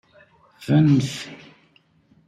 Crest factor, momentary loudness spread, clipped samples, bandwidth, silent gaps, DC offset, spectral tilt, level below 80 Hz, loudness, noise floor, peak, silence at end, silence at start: 16 dB; 21 LU; under 0.1%; 12 kHz; none; under 0.1%; -7 dB/octave; -58 dBFS; -19 LUFS; -59 dBFS; -6 dBFS; 0.9 s; 0.6 s